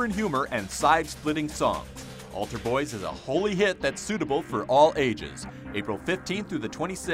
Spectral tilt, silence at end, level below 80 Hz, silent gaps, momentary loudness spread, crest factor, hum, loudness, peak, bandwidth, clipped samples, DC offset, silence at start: -4.5 dB/octave; 0 s; -50 dBFS; none; 12 LU; 20 dB; none; -27 LUFS; -6 dBFS; 16 kHz; under 0.1%; under 0.1%; 0 s